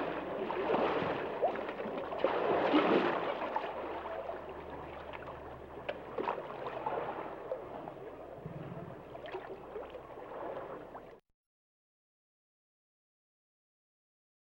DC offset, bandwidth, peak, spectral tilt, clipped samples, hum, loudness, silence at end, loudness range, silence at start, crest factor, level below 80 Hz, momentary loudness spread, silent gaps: under 0.1%; 16 kHz; -16 dBFS; -7 dB/octave; under 0.1%; none; -37 LUFS; 3.4 s; 15 LU; 0 s; 22 dB; -64 dBFS; 16 LU; none